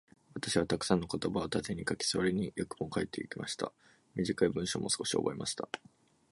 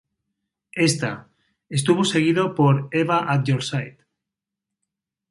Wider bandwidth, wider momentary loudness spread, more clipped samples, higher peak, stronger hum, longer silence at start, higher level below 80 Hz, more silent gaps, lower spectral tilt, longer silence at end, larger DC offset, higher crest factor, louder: about the same, 11.5 kHz vs 11.5 kHz; about the same, 9 LU vs 11 LU; neither; second, -12 dBFS vs -6 dBFS; neither; second, 0.35 s vs 0.75 s; about the same, -60 dBFS vs -62 dBFS; neither; second, -4 dB/octave vs -5.5 dB/octave; second, 0.55 s vs 1.4 s; neither; first, 24 dB vs 18 dB; second, -34 LUFS vs -21 LUFS